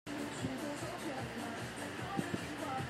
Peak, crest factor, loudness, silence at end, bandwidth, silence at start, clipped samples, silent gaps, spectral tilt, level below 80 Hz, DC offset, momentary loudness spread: -20 dBFS; 20 dB; -41 LUFS; 0 s; 16 kHz; 0.05 s; under 0.1%; none; -4.5 dB/octave; -66 dBFS; under 0.1%; 3 LU